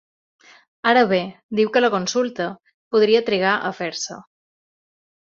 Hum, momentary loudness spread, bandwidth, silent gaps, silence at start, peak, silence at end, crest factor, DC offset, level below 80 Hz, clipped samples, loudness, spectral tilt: none; 12 LU; 7.6 kHz; 1.43-1.49 s, 2.74-2.91 s; 0.85 s; -2 dBFS; 1.2 s; 20 dB; under 0.1%; -66 dBFS; under 0.1%; -20 LUFS; -4 dB/octave